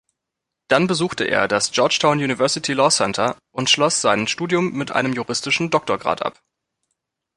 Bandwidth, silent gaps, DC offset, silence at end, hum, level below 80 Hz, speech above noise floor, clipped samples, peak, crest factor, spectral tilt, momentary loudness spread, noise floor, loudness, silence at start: 11.5 kHz; none; under 0.1%; 1.05 s; none; -58 dBFS; 63 dB; under 0.1%; -2 dBFS; 18 dB; -3 dB/octave; 6 LU; -82 dBFS; -19 LUFS; 0.7 s